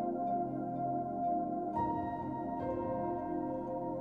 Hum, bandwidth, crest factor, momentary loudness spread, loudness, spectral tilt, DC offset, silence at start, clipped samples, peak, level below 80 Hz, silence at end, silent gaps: none; 4 kHz; 12 dB; 3 LU; -37 LUFS; -10.5 dB/octave; under 0.1%; 0 s; under 0.1%; -24 dBFS; -62 dBFS; 0 s; none